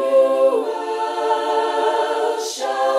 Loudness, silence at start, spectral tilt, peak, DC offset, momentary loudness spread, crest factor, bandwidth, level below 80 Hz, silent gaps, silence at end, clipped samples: -19 LUFS; 0 s; -0.5 dB/octave; -6 dBFS; under 0.1%; 7 LU; 12 dB; 14 kHz; -76 dBFS; none; 0 s; under 0.1%